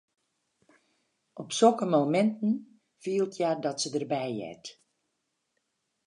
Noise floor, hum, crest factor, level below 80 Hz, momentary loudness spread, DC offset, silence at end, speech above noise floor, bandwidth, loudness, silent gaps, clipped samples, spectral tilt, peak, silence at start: -80 dBFS; none; 22 dB; -82 dBFS; 20 LU; under 0.1%; 1.35 s; 53 dB; 11 kHz; -28 LUFS; none; under 0.1%; -5 dB/octave; -10 dBFS; 1.35 s